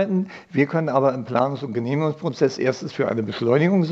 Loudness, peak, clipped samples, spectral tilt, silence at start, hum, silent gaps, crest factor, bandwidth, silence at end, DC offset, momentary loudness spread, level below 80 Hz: -22 LUFS; -4 dBFS; under 0.1%; -7.5 dB/octave; 0 s; none; none; 16 dB; 7.8 kHz; 0 s; under 0.1%; 6 LU; -70 dBFS